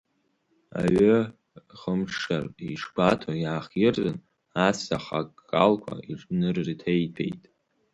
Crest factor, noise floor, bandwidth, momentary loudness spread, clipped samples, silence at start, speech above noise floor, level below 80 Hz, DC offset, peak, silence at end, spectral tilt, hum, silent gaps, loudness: 22 dB; -71 dBFS; 11 kHz; 13 LU; under 0.1%; 0.75 s; 46 dB; -56 dBFS; under 0.1%; -6 dBFS; 0.55 s; -6.5 dB/octave; none; none; -26 LUFS